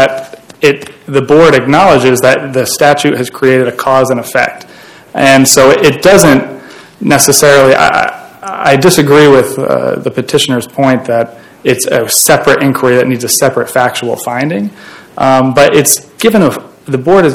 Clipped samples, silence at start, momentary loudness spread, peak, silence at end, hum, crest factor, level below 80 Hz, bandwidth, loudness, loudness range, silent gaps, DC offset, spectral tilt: 6%; 0 s; 11 LU; 0 dBFS; 0 s; none; 8 dB; -42 dBFS; over 20 kHz; -8 LUFS; 4 LU; none; under 0.1%; -4 dB/octave